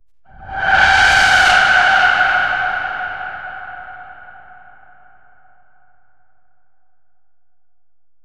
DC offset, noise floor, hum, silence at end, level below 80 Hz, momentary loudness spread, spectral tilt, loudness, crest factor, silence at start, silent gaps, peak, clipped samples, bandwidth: 0.7%; -78 dBFS; none; 3.95 s; -40 dBFS; 21 LU; -1 dB/octave; -12 LUFS; 18 dB; 0.4 s; none; 0 dBFS; under 0.1%; 14 kHz